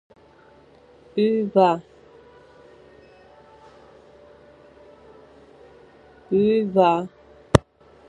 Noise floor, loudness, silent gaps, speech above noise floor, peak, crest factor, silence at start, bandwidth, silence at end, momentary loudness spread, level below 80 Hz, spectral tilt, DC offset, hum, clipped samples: -52 dBFS; -21 LUFS; none; 33 dB; 0 dBFS; 26 dB; 1.15 s; 11.5 kHz; 0.5 s; 10 LU; -46 dBFS; -7 dB/octave; under 0.1%; none; under 0.1%